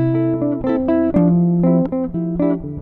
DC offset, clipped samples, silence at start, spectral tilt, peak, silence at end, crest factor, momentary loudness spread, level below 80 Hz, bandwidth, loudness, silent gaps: under 0.1%; under 0.1%; 0 s; -12.5 dB/octave; -4 dBFS; 0 s; 12 dB; 6 LU; -40 dBFS; 3.9 kHz; -17 LUFS; none